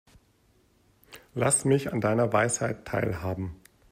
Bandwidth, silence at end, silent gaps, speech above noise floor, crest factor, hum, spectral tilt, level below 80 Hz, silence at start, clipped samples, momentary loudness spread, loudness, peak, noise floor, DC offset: 16 kHz; 0.35 s; none; 38 dB; 18 dB; none; -5 dB/octave; -56 dBFS; 1.1 s; under 0.1%; 11 LU; -26 LUFS; -10 dBFS; -65 dBFS; under 0.1%